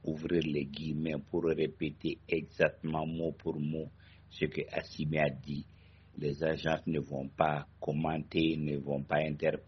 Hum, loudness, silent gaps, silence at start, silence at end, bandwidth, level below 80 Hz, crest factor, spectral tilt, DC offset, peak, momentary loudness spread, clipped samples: none; -34 LUFS; none; 0.05 s; 0.05 s; 6.4 kHz; -60 dBFS; 24 dB; -5.5 dB/octave; under 0.1%; -12 dBFS; 8 LU; under 0.1%